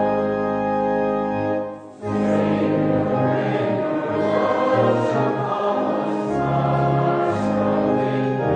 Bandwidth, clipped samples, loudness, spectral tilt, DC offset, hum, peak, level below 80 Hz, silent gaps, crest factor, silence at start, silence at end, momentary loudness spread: 9.2 kHz; under 0.1%; -21 LUFS; -8.5 dB/octave; under 0.1%; none; -6 dBFS; -50 dBFS; none; 14 dB; 0 s; 0 s; 4 LU